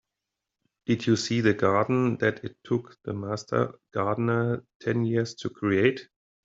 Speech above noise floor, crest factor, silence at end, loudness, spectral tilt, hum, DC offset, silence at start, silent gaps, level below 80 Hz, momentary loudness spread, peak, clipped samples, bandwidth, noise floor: 60 dB; 22 dB; 0.4 s; -27 LUFS; -6.5 dB/octave; none; under 0.1%; 0.9 s; 4.75-4.80 s; -66 dBFS; 9 LU; -6 dBFS; under 0.1%; 7.8 kHz; -86 dBFS